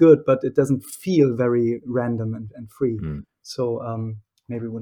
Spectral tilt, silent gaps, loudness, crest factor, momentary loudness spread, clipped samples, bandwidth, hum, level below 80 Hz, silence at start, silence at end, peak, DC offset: -8 dB/octave; none; -22 LUFS; 18 dB; 16 LU; under 0.1%; 18 kHz; none; -54 dBFS; 0 s; 0 s; -2 dBFS; under 0.1%